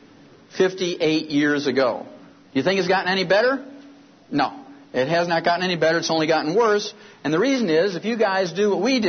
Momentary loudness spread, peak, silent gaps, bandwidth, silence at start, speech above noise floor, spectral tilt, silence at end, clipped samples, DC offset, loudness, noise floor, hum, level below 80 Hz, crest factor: 9 LU; -6 dBFS; none; 6.6 kHz; 0.55 s; 29 dB; -4.5 dB/octave; 0 s; under 0.1%; under 0.1%; -21 LUFS; -49 dBFS; none; -68 dBFS; 16 dB